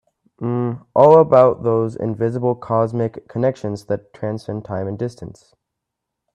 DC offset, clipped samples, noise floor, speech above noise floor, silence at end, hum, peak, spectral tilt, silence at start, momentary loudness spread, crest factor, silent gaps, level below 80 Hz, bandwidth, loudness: under 0.1%; under 0.1%; -80 dBFS; 63 dB; 1.05 s; none; 0 dBFS; -9 dB/octave; 0.4 s; 17 LU; 18 dB; none; -58 dBFS; 9.6 kHz; -18 LUFS